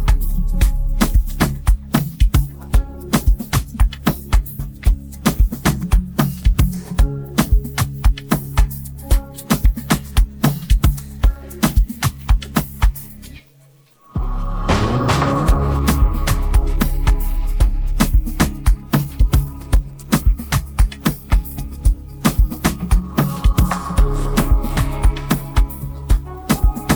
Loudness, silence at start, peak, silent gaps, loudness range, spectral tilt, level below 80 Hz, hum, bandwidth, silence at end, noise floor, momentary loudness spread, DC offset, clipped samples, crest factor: -19 LUFS; 0 s; -2 dBFS; none; 2 LU; -5.5 dB/octave; -18 dBFS; none; over 20 kHz; 0 s; -50 dBFS; 4 LU; under 0.1%; under 0.1%; 14 dB